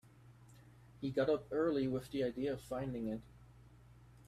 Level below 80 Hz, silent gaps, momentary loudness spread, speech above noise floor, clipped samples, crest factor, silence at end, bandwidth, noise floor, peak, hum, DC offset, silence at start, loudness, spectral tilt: -64 dBFS; none; 8 LU; 24 dB; under 0.1%; 18 dB; 0.05 s; 14.5 kHz; -61 dBFS; -22 dBFS; none; under 0.1%; 0.05 s; -38 LUFS; -7 dB/octave